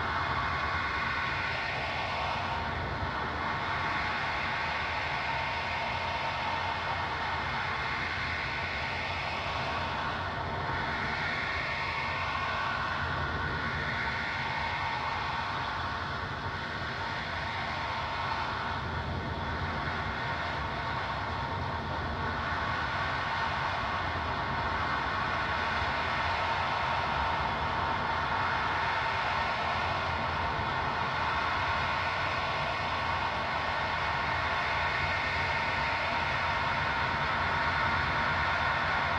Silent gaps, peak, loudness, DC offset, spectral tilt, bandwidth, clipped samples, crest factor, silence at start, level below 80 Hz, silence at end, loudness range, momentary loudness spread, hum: none; -16 dBFS; -31 LUFS; under 0.1%; -5 dB/octave; 10.5 kHz; under 0.1%; 16 dB; 0 s; -48 dBFS; 0 s; 4 LU; 4 LU; none